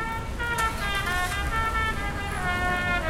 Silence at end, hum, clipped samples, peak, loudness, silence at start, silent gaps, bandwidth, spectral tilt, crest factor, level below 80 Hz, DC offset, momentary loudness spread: 0 s; none; under 0.1%; -14 dBFS; -27 LUFS; 0 s; none; 17 kHz; -4 dB/octave; 14 dB; -34 dBFS; under 0.1%; 5 LU